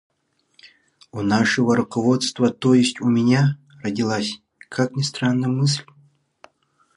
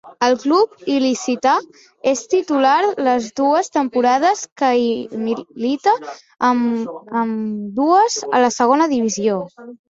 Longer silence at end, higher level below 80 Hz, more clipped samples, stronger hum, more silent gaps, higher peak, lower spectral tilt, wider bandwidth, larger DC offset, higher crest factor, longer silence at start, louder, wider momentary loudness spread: first, 1.15 s vs 0.15 s; about the same, -60 dBFS vs -64 dBFS; neither; neither; second, none vs 4.52-4.56 s; about the same, -4 dBFS vs -2 dBFS; first, -5.5 dB/octave vs -4 dB/octave; first, 11 kHz vs 7.8 kHz; neither; about the same, 16 dB vs 16 dB; first, 0.65 s vs 0.05 s; about the same, -20 LUFS vs -18 LUFS; first, 11 LU vs 8 LU